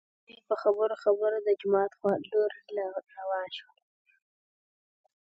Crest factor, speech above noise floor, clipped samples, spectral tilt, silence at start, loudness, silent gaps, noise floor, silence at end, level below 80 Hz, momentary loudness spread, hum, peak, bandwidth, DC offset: 18 dB; over 61 dB; under 0.1%; -7 dB/octave; 0.3 s; -30 LUFS; none; under -90 dBFS; 1.7 s; -82 dBFS; 10 LU; none; -12 dBFS; 5.6 kHz; under 0.1%